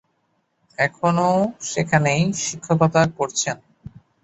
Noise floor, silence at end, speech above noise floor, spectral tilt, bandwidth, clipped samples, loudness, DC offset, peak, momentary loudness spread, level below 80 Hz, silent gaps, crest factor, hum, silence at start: -69 dBFS; 0.35 s; 49 dB; -5 dB/octave; 8.2 kHz; under 0.1%; -20 LUFS; under 0.1%; -4 dBFS; 8 LU; -54 dBFS; none; 18 dB; none; 0.8 s